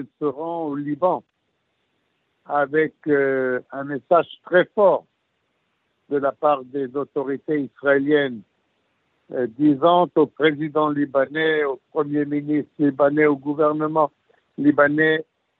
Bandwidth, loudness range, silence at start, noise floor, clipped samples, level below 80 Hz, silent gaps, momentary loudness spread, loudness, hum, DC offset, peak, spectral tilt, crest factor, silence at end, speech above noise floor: 4.1 kHz; 4 LU; 0 s; -72 dBFS; under 0.1%; -74 dBFS; none; 10 LU; -21 LUFS; none; under 0.1%; -4 dBFS; -4.5 dB/octave; 18 dB; 0.4 s; 51 dB